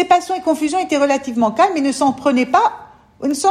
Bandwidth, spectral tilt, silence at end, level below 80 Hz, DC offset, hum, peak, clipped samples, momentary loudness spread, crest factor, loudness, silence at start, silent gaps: 13.5 kHz; -3.5 dB/octave; 0 s; -58 dBFS; under 0.1%; none; -2 dBFS; under 0.1%; 5 LU; 14 dB; -17 LUFS; 0 s; none